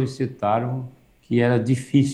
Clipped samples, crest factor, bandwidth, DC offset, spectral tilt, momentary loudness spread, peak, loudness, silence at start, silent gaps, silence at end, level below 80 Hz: under 0.1%; 16 dB; 11.5 kHz; under 0.1%; -7.5 dB/octave; 10 LU; -6 dBFS; -22 LUFS; 0 s; none; 0 s; -60 dBFS